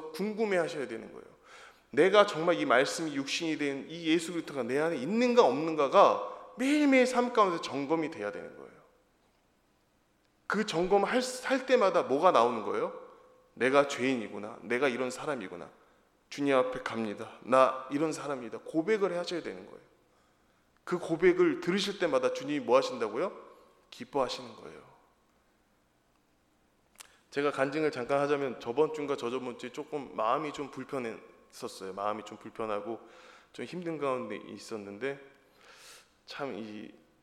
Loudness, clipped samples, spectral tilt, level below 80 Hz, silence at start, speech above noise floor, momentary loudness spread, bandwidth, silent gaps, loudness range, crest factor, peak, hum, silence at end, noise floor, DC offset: -30 LUFS; under 0.1%; -4.5 dB/octave; -70 dBFS; 0 s; 40 dB; 18 LU; 14 kHz; none; 11 LU; 24 dB; -8 dBFS; none; 0.35 s; -70 dBFS; under 0.1%